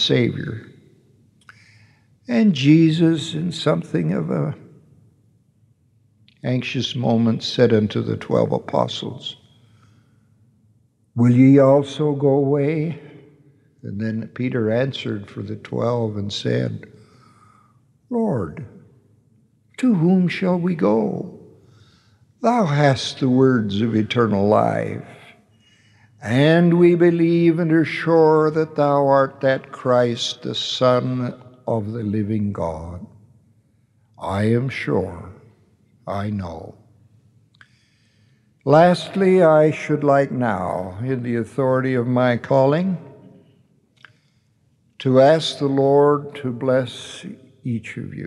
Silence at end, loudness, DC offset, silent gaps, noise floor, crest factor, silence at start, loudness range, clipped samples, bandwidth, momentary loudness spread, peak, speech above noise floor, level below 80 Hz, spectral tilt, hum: 0 s; -19 LUFS; under 0.1%; none; -61 dBFS; 20 dB; 0 s; 9 LU; under 0.1%; 11 kHz; 16 LU; 0 dBFS; 43 dB; -62 dBFS; -7 dB/octave; none